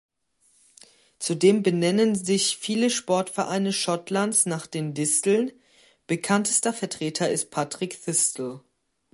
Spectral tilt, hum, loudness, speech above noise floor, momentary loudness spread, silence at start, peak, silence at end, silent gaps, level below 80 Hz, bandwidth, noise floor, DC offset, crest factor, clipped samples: -3.5 dB/octave; none; -24 LUFS; 41 dB; 9 LU; 1.2 s; -6 dBFS; 0.55 s; none; -72 dBFS; 12 kHz; -65 dBFS; under 0.1%; 18 dB; under 0.1%